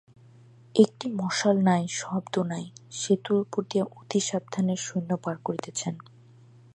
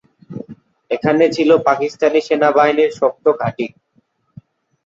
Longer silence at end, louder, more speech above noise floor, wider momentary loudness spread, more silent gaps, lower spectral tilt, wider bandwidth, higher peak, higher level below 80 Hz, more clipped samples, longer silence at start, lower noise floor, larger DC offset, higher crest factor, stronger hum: second, 0.75 s vs 1.15 s; second, -27 LUFS vs -15 LUFS; second, 27 dB vs 46 dB; second, 10 LU vs 20 LU; neither; about the same, -5 dB/octave vs -6 dB/octave; first, 10.5 kHz vs 7.6 kHz; about the same, -4 dBFS vs -2 dBFS; second, -74 dBFS vs -60 dBFS; neither; first, 0.75 s vs 0.3 s; second, -53 dBFS vs -61 dBFS; neither; first, 22 dB vs 16 dB; neither